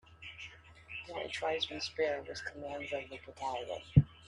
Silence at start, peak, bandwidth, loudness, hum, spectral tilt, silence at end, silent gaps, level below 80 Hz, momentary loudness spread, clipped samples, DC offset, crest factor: 0.1 s; -8 dBFS; 11 kHz; -36 LUFS; none; -6 dB/octave; 0 s; none; -54 dBFS; 19 LU; under 0.1%; under 0.1%; 28 dB